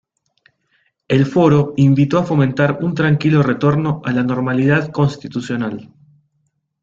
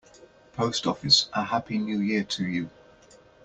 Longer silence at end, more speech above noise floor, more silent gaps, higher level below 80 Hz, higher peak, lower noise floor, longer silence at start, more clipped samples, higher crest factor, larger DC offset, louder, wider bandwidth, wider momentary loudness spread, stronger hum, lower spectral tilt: first, 0.95 s vs 0.75 s; first, 52 dB vs 28 dB; neither; first, -52 dBFS vs -62 dBFS; about the same, -2 dBFS vs -4 dBFS; first, -67 dBFS vs -55 dBFS; first, 1.1 s vs 0.2 s; neither; second, 14 dB vs 24 dB; neither; first, -16 LUFS vs -25 LUFS; second, 7.4 kHz vs 9 kHz; second, 9 LU vs 12 LU; neither; first, -8 dB/octave vs -3.5 dB/octave